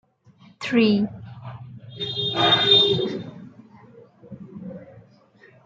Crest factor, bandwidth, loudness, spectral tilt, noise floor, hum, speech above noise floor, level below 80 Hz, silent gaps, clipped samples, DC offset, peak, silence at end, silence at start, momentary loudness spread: 20 dB; 7.8 kHz; -19 LUFS; -5.5 dB/octave; -53 dBFS; none; 35 dB; -64 dBFS; none; under 0.1%; under 0.1%; -4 dBFS; 0.65 s; 0.6 s; 26 LU